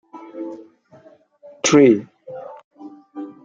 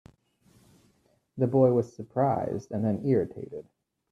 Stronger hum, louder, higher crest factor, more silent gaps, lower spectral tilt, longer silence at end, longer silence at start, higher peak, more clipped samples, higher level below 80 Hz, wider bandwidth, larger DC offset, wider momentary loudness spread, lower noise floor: neither; first, -15 LUFS vs -27 LUFS; about the same, 20 dB vs 20 dB; first, 2.64-2.71 s vs none; second, -4.5 dB/octave vs -10 dB/octave; second, 0.15 s vs 0.5 s; second, 0.15 s vs 1.35 s; first, -2 dBFS vs -8 dBFS; neither; about the same, -64 dBFS vs -66 dBFS; first, 9.2 kHz vs 7.6 kHz; neither; first, 26 LU vs 18 LU; second, -50 dBFS vs -68 dBFS